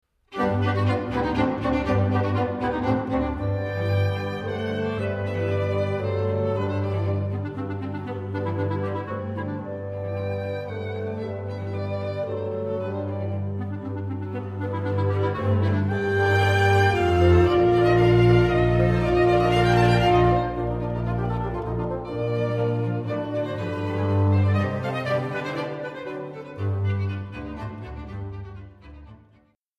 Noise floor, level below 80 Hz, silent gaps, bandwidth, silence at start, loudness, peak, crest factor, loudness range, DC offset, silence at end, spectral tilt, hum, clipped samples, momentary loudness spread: -60 dBFS; -40 dBFS; none; 9.2 kHz; 0.3 s; -24 LUFS; -6 dBFS; 18 dB; 11 LU; under 0.1%; 0.65 s; -8 dB/octave; none; under 0.1%; 13 LU